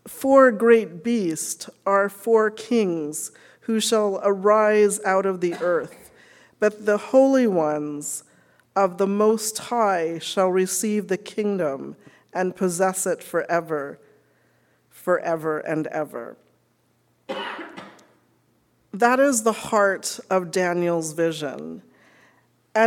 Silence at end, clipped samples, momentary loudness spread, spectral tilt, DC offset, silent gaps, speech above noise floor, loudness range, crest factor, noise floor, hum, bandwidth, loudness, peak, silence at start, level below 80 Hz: 0 s; under 0.1%; 15 LU; -4 dB/octave; under 0.1%; none; 44 dB; 8 LU; 20 dB; -65 dBFS; none; 18 kHz; -22 LUFS; -2 dBFS; 0.05 s; -72 dBFS